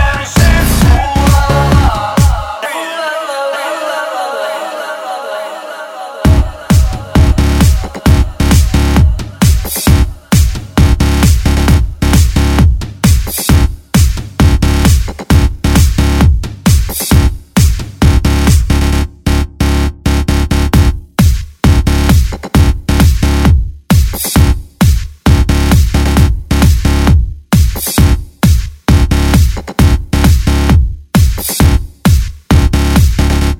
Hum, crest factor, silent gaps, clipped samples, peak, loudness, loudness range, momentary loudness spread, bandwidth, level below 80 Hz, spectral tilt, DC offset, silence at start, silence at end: none; 10 dB; none; 0.3%; 0 dBFS; -11 LUFS; 3 LU; 7 LU; 17 kHz; -12 dBFS; -5.5 dB/octave; under 0.1%; 0 s; 0.05 s